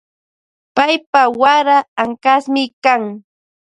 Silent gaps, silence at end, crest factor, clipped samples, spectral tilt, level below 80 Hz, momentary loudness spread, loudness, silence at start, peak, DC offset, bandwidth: 1.06-1.13 s, 1.88-1.96 s, 2.73-2.82 s; 0.6 s; 16 dB; under 0.1%; -3.5 dB/octave; -64 dBFS; 8 LU; -14 LUFS; 0.75 s; 0 dBFS; under 0.1%; 9.6 kHz